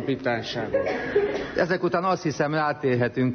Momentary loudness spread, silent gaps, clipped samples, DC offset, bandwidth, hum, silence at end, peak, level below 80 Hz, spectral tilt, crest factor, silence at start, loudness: 3 LU; none; under 0.1%; under 0.1%; 6.6 kHz; none; 0 s; -10 dBFS; -54 dBFS; -6.5 dB/octave; 14 dB; 0 s; -25 LUFS